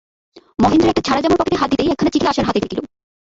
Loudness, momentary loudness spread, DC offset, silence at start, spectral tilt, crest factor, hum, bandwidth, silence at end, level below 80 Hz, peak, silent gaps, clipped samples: -16 LUFS; 9 LU; under 0.1%; 0.35 s; -5.5 dB/octave; 14 dB; none; 8 kHz; 0.4 s; -40 dBFS; -2 dBFS; none; under 0.1%